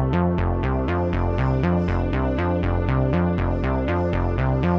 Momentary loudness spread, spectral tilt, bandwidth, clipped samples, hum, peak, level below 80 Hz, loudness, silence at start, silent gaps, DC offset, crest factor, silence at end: 2 LU; -9.5 dB/octave; 6 kHz; under 0.1%; none; -8 dBFS; -28 dBFS; -22 LUFS; 0 s; none; under 0.1%; 12 dB; 0 s